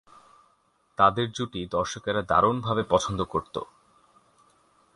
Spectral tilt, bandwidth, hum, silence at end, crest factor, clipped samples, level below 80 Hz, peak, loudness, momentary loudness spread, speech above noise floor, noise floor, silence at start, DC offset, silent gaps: -5 dB/octave; 11.5 kHz; none; 1.3 s; 22 dB; under 0.1%; -52 dBFS; -6 dBFS; -26 LUFS; 15 LU; 41 dB; -67 dBFS; 1 s; under 0.1%; none